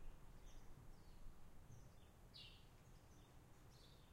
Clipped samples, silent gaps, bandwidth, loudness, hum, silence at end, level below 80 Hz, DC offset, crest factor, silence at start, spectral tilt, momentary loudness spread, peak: under 0.1%; none; 16 kHz; -66 LUFS; none; 0 s; -64 dBFS; under 0.1%; 16 dB; 0 s; -4.5 dB/octave; 7 LU; -44 dBFS